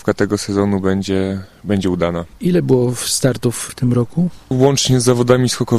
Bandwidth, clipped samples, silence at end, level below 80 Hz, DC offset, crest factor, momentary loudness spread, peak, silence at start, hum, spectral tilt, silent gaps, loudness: 13.5 kHz; under 0.1%; 0 s; -44 dBFS; under 0.1%; 16 dB; 7 LU; 0 dBFS; 0.05 s; none; -5.5 dB/octave; none; -16 LUFS